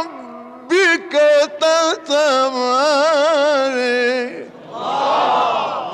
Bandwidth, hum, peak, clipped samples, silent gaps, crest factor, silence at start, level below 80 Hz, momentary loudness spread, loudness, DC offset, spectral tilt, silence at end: 11.5 kHz; none; -6 dBFS; under 0.1%; none; 10 dB; 0 s; -68 dBFS; 14 LU; -15 LUFS; under 0.1%; -2 dB/octave; 0 s